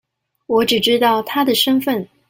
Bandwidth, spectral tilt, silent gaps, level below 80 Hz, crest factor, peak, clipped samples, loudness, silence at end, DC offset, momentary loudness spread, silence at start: 17 kHz; -3.5 dB/octave; none; -58 dBFS; 14 dB; -2 dBFS; under 0.1%; -16 LUFS; 0.25 s; under 0.1%; 5 LU; 0.5 s